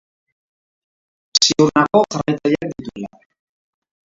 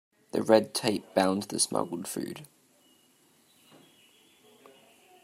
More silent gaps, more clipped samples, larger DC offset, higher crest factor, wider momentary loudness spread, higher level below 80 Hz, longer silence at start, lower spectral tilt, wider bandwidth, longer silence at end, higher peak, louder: neither; neither; neither; second, 20 dB vs 26 dB; first, 18 LU vs 13 LU; first, -54 dBFS vs -76 dBFS; first, 1.35 s vs 0.35 s; about the same, -3.5 dB/octave vs -3.5 dB/octave; second, 7.8 kHz vs 16 kHz; second, 1.05 s vs 2.8 s; first, 0 dBFS vs -6 dBFS; first, -16 LUFS vs -28 LUFS